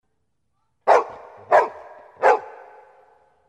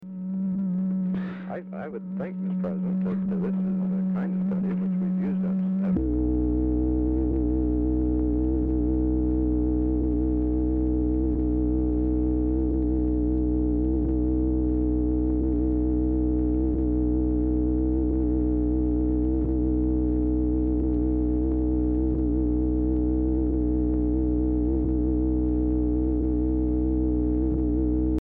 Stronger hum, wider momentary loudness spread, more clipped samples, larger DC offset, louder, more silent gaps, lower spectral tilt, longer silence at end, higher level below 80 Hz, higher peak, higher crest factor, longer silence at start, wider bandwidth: neither; first, 23 LU vs 2 LU; neither; neither; first, -20 LUFS vs -25 LUFS; neither; second, -3.5 dB/octave vs -13.5 dB/octave; first, 1 s vs 0 s; second, -70 dBFS vs -28 dBFS; first, -2 dBFS vs -14 dBFS; first, 22 dB vs 10 dB; first, 0.85 s vs 0 s; first, 11 kHz vs 2.6 kHz